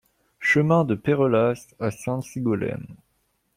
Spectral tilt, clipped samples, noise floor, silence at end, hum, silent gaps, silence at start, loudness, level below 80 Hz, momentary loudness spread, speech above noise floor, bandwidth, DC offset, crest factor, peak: -7 dB/octave; under 0.1%; -70 dBFS; 0.6 s; none; none; 0.4 s; -23 LUFS; -60 dBFS; 11 LU; 47 dB; 15.5 kHz; under 0.1%; 16 dB; -8 dBFS